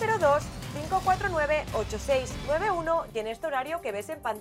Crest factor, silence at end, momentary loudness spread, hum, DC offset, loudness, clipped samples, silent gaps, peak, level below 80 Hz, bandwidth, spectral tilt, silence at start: 16 dB; 0 s; 9 LU; none; under 0.1%; -28 LUFS; under 0.1%; none; -12 dBFS; -44 dBFS; 16 kHz; -4.5 dB/octave; 0 s